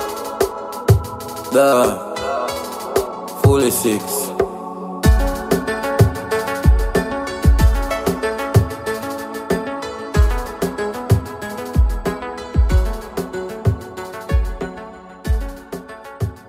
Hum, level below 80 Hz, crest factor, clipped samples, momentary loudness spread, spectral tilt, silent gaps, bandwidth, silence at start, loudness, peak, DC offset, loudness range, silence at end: none; -22 dBFS; 18 dB; under 0.1%; 13 LU; -6 dB/octave; none; 16 kHz; 0 s; -19 LUFS; 0 dBFS; under 0.1%; 5 LU; 0 s